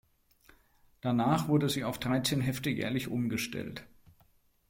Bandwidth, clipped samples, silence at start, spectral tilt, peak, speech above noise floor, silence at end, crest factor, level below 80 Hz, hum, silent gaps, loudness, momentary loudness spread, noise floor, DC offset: 16.5 kHz; under 0.1%; 1.05 s; -5.5 dB/octave; -14 dBFS; 36 dB; 0.85 s; 18 dB; -60 dBFS; none; none; -31 LUFS; 10 LU; -67 dBFS; under 0.1%